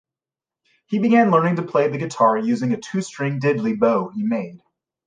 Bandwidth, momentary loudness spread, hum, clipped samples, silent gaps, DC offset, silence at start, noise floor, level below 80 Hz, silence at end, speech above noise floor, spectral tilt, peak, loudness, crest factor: 9.6 kHz; 10 LU; none; under 0.1%; none; under 0.1%; 0.9 s; under -90 dBFS; -70 dBFS; 0.5 s; over 71 dB; -7 dB/octave; -4 dBFS; -20 LUFS; 16 dB